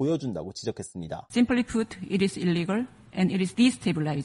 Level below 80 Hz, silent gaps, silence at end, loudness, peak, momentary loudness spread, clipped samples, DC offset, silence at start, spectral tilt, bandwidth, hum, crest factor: -56 dBFS; none; 0 s; -27 LUFS; -10 dBFS; 11 LU; under 0.1%; under 0.1%; 0 s; -6 dB/octave; 11.5 kHz; none; 16 dB